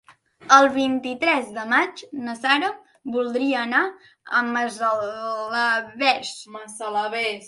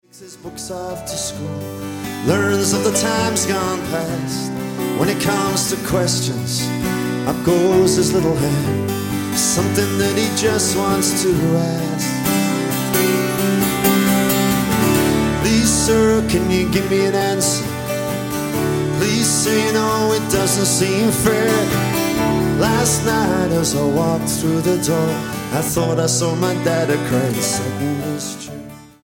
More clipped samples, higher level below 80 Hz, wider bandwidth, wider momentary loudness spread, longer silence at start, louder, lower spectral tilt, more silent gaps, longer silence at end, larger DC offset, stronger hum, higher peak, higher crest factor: neither; second, -70 dBFS vs -40 dBFS; second, 11.5 kHz vs 17 kHz; first, 13 LU vs 8 LU; about the same, 0.1 s vs 0.15 s; second, -21 LUFS vs -17 LUFS; second, -2 dB/octave vs -4.5 dB/octave; neither; second, 0 s vs 0.15 s; neither; neither; about the same, 0 dBFS vs -2 dBFS; first, 22 dB vs 16 dB